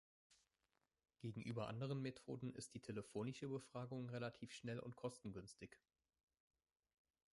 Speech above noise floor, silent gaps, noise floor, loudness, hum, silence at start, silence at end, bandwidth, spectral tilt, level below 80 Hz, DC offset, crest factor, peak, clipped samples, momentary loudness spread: 39 dB; none; -90 dBFS; -51 LUFS; none; 0.3 s; 1.55 s; 11.5 kHz; -6 dB/octave; -80 dBFS; under 0.1%; 18 dB; -34 dBFS; under 0.1%; 8 LU